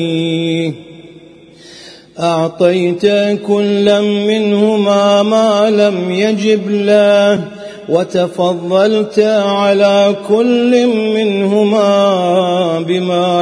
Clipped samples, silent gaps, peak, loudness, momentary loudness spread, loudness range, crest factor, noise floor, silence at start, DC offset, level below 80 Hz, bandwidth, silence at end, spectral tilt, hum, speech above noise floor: under 0.1%; none; 0 dBFS; -12 LUFS; 6 LU; 3 LU; 12 dB; -39 dBFS; 0 s; under 0.1%; -60 dBFS; 10.5 kHz; 0 s; -6 dB/octave; none; 27 dB